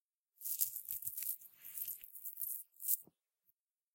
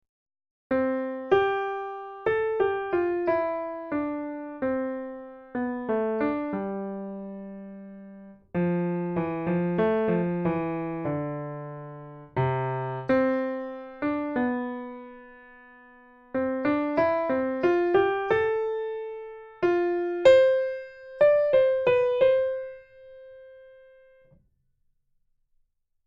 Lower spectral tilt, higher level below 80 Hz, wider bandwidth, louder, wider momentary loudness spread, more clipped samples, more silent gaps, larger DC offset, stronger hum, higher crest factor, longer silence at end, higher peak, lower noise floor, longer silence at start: second, 1.5 dB/octave vs -8 dB/octave; second, -88 dBFS vs -62 dBFS; first, 17 kHz vs 7.4 kHz; second, -40 LUFS vs -26 LUFS; second, 10 LU vs 17 LU; neither; neither; neither; neither; first, 32 dB vs 20 dB; second, 0.9 s vs 2.35 s; second, -14 dBFS vs -6 dBFS; first, -82 dBFS vs -70 dBFS; second, 0.4 s vs 0.7 s